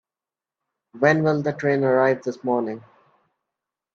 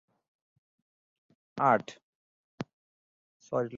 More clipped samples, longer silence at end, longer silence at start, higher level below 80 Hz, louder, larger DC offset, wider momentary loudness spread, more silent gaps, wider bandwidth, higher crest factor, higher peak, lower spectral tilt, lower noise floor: neither; first, 1.15 s vs 0 s; second, 0.95 s vs 1.55 s; first, -68 dBFS vs -76 dBFS; first, -21 LUFS vs -29 LUFS; neither; second, 7 LU vs 20 LU; second, none vs 2.03-2.58 s, 2.73-3.40 s; about the same, 7.4 kHz vs 7.4 kHz; about the same, 20 dB vs 24 dB; first, -4 dBFS vs -10 dBFS; first, -7.5 dB/octave vs -5 dB/octave; about the same, under -90 dBFS vs under -90 dBFS